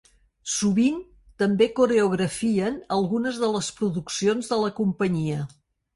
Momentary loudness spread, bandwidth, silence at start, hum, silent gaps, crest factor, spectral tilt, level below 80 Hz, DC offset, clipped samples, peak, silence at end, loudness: 8 LU; 11.5 kHz; 0.45 s; none; none; 16 dB; -5 dB/octave; -58 dBFS; under 0.1%; under 0.1%; -8 dBFS; 0.5 s; -24 LUFS